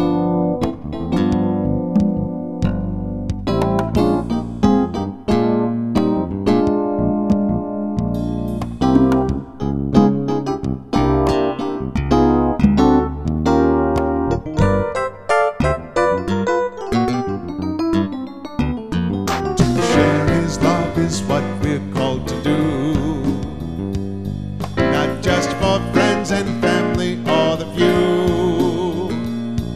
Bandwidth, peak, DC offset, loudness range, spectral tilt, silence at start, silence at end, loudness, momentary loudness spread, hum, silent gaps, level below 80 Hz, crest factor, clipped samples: 14.5 kHz; 0 dBFS; 0.6%; 4 LU; -6.5 dB/octave; 0 s; 0 s; -18 LUFS; 9 LU; none; none; -32 dBFS; 18 dB; under 0.1%